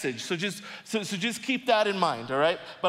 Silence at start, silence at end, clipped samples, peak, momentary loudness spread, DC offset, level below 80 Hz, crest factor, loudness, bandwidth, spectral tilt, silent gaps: 0 s; 0 s; under 0.1%; -10 dBFS; 8 LU; under 0.1%; -76 dBFS; 18 dB; -27 LUFS; 16 kHz; -3.5 dB/octave; none